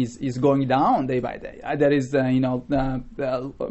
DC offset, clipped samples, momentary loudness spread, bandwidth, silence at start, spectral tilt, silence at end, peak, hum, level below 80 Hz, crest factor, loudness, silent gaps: 0.2%; under 0.1%; 9 LU; 8.2 kHz; 0 s; -7.5 dB/octave; 0 s; -8 dBFS; none; -42 dBFS; 14 dB; -23 LUFS; none